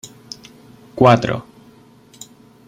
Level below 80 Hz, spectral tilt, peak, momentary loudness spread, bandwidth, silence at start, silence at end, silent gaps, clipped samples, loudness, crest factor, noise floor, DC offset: -50 dBFS; -6.5 dB/octave; -2 dBFS; 27 LU; 15.5 kHz; 0.05 s; 1.25 s; none; under 0.1%; -15 LUFS; 20 dB; -47 dBFS; under 0.1%